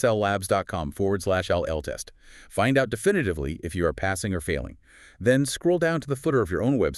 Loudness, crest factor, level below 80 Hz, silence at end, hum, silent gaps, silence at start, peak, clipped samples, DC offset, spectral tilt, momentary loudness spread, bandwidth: -25 LUFS; 16 dB; -44 dBFS; 0 s; none; none; 0 s; -8 dBFS; under 0.1%; under 0.1%; -5.5 dB/octave; 9 LU; 13.5 kHz